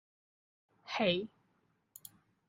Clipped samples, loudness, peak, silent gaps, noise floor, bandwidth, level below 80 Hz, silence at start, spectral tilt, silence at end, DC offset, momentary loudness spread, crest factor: under 0.1%; -34 LUFS; -18 dBFS; none; -76 dBFS; 15.5 kHz; -76 dBFS; 0.85 s; -5 dB/octave; 1.2 s; under 0.1%; 23 LU; 22 dB